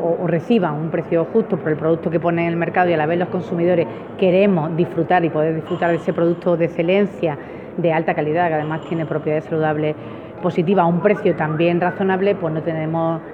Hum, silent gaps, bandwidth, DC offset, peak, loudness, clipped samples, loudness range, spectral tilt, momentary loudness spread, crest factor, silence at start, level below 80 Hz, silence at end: none; none; 5 kHz; under 0.1%; -2 dBFS; -19 LUFS; under 0.1%; 2 LU; -9 dB/octave; 6 LU; 16 dB; 0 s; -58 dBFS; 0 s